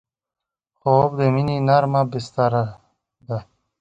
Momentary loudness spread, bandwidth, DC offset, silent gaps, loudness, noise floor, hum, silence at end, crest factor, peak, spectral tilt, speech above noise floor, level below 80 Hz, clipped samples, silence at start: 14 LU; 8 kHz; under 0.1%; none; -20 LUFS; -71 dBFS; none; 0.35 s; 18 dB; -2 dBFS; -8 dB/octave; 53 dB; -54 dBFS; under 0.1%; 0.85 s